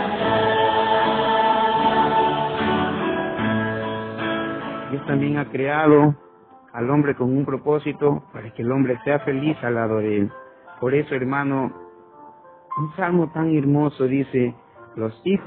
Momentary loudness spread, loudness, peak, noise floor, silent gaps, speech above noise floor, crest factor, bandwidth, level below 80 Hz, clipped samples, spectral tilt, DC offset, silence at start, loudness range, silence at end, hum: 10 LU; -21 LUFS; -2 dBFS; -46 dBFS; none; 25 dB; 18 dB; 4.5 kHz; -56 dBFS; under 0.1%; -11.5 dB/octave; under 0.1%; 0 s; 4 LU; 0 s; none